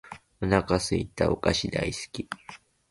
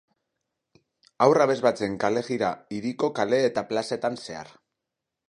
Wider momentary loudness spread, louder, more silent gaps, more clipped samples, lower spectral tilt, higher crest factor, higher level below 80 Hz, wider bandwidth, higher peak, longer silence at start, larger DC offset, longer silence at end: first, 15 LU vs 12 LU; second, -28 LUFS vs -25 LUFS; neither; neither; about the same, -5 dB/octave vs -5.5 dB/octave; about the same, 20 dB vs 22 dB; first, -44 dBFS vs -66 dBFS; about the same, 11.5 kHz vs 11 kHz; second, -8 dBFS vs -4 dBFS; second, 0.05 s vs 1.2 s; neither; second, 0.35 s vs 0.85 s